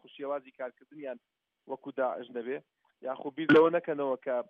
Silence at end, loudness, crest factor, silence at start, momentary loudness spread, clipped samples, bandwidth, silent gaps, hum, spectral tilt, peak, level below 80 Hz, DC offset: 0.05 s; -30 LUFS; 18 dB; 0.15 s; 20 LU; under 0.1%; 5.4 kHz; none; none; -4 dB/octave; -12 dBFS; -78 dBFS; under 0.1%